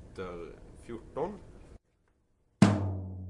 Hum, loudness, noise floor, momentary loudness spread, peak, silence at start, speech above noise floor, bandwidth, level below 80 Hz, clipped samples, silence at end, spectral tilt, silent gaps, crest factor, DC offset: none; -31 LUFS; -72 dBFS; 23 LU; -6 dBFS; 0 s; 32 dB; 11.5 kHz; -56 dBFS; under 0.1%; 0 s; -7 dB/octave; none; 28 dB; under 0.1%